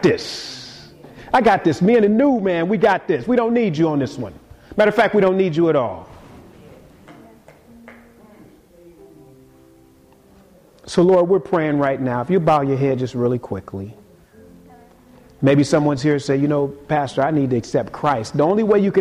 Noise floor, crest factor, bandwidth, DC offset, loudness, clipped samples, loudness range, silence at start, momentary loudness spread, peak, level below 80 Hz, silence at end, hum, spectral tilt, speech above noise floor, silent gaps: -50 dBFS; 14 dB; 12.5 kHz; under 0.1%; -18 LUFS; under 0.1%; 5 LU; 0 s; 13 LU; -4 dBFS; -52 dBFS; 0 s; none; -7 dB/octave; 33 dB; none